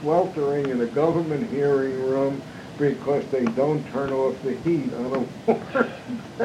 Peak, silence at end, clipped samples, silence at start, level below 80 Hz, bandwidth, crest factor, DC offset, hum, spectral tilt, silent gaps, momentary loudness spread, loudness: -4 dBFS; 0 s; under 0.1%; 0 s; -60 dBFS; 11.5 kHz; 18 dB; under 0.1%; none; -7.5 dB/octave; none; 5 LU; -24 LUFS